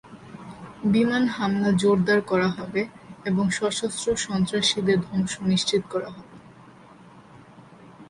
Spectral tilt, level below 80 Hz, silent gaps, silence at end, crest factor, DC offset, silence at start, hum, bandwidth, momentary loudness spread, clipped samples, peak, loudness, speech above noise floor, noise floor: -5 dB/octave; -56 dBFS; none; 0.05 s; 16 dB; under 0.1%; 0.05 s; none; 11.5 kHz; 17 LU; under 0.1%; -8 dBFS; -24 LUFS; 26 dB; -49 dBFS